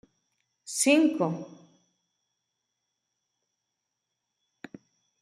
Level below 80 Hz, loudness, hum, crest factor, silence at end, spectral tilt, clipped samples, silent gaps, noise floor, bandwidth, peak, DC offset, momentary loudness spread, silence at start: -84 dBFS; -25 LUFS; none; 24 dB; 3.75 s; -3.5 dB/octave; under 0.1%; none; -84 dBFS; 13.5 kHz; -8 dBFS; under 0.1%; 26 LU; 0.65 s